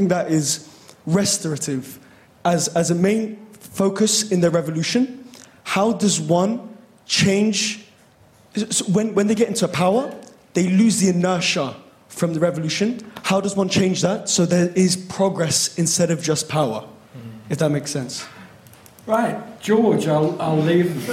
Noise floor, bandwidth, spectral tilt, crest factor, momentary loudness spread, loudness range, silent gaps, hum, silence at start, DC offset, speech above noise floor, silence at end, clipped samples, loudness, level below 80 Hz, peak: -52 dBFS; 16 kHz; -4.5 dB/octave; 14 dB; 13 LU; 3 LU; none; none; 0 s; under 0.1%; 33 dB; 0 s; under 0.1%; -20 LUFS; -60 dBFS; -6 dBFS